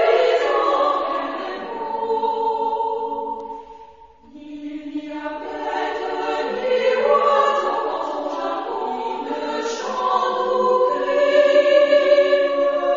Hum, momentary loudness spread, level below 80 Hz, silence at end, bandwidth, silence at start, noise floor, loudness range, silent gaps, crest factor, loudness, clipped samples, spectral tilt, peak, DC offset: none; 15 LU; -62 dBFS; 0 s; 7.6 kHz; 0 s; -46 dBFS; 11 LU; none; 16 dB; -20 LUFS; under 0.1%; -3 dB/octave; -4 dBFS; 0.2%